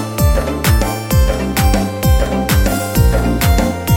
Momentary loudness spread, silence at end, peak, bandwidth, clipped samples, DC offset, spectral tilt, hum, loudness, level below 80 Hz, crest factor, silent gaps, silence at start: 2 LU; 0 s; 0 dBFS; 17 kHz; under 0.1%; under 0.1%; -5.5 dB/octave; none; -15 LUFS; -16 dBFS; 12 dB; none; 0 s